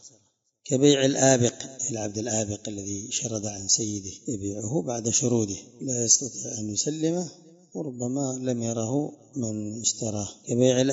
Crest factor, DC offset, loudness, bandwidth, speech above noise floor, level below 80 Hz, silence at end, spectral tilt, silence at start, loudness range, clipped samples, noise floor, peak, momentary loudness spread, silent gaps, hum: 22 dB; under 0.1%; -26 LUFS; 8 kHz; 41 dB; -64 dBFS; 0 s; -4 dB/octave; 0.05 s; 5 LU; under 0.1%; -67 dBFS; -6 dBFS; 13 LU; none; none